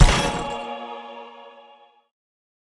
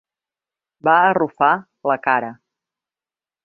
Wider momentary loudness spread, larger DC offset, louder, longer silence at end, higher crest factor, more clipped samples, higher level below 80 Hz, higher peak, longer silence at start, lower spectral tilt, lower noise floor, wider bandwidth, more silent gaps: first, 23 LU vs 8 LU; neither; second, -25 LUFS vs -18 LUFS; first, 1.3 s vs 1.1 s; about the same, 24 dB vs 20 dB; neither; first, -28 dBFS vs -70 dBFS; about the same, 0 dBFS vs -2 dBFS; second, 0 s vs 0.85 s; second, -4.5 dB/octave vs -8 dB/octave; second, -52 dBFS vs under -90 dBFS; first, 12 kHz vs 4.6 kHz; neither